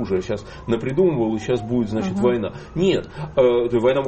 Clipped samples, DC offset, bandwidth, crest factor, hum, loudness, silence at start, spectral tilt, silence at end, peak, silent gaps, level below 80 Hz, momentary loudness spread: under 0.1%; under 0.1%; 8.4 kHz; 14 dB; none; -21 LUFS; 0 s; -7 dB/octave; 0 s; -6 dBFS; none; -46 dBFS; 8 LU